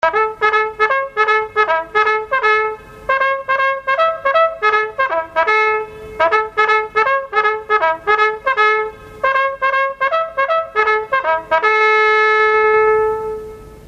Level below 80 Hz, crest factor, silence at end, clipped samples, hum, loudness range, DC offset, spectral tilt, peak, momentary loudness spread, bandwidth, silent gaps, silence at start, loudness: -50 dBFS; 14 dB; 0.05 s; under 0.1%; none; 2 LU; under 0.1%; -3 dB/octave; -2 dBFS; 6 LU; 8 kHz; none; 0.05 s; -15 LUFS